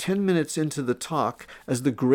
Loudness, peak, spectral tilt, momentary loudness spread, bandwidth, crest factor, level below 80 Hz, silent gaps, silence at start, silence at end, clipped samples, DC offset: -26 LUFS; -8 dBFS; -5.5 dB/octave; 7 LU; 18 kHz; 16 dB; -64 dBFS; none; 0 s; 0 s; under 0.1%; under 0.1%